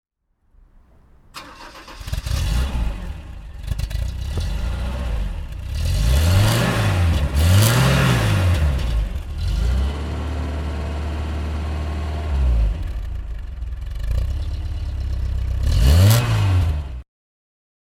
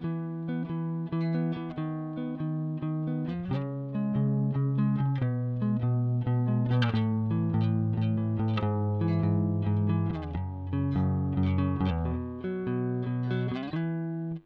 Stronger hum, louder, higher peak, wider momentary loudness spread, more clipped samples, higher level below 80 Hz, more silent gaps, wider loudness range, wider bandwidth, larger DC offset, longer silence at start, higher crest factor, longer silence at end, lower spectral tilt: neither; first, -21 LUFS vs -30 LUFS; first, -2 dBFS vs -14 dBFS; first, 16 LU vs 7 LU; neither; first, -24 dBFS vs -50 dBFS; neither; first, 10 LU vs 4 LU; first, 18 kHz vs 5.2 kHz; neither; first, 1.35 s vs 0 s; about the same, 18 dB vs 14 dB; first, 0.85 s vs 0.05 s; second, -5.5 dB/octave vs -10.5 dB/octave